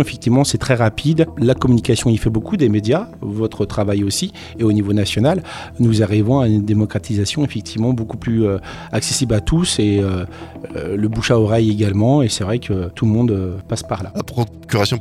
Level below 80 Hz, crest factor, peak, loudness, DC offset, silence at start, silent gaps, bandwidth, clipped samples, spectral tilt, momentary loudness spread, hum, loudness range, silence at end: -38 dBFS; 14 dB; -2 dBFS; -17 LUFS; under 0.1%; 0 s; none; 14 kHz; under 0.1%; -6 dB/octave; 9 LU; none; 2 LU; 0 s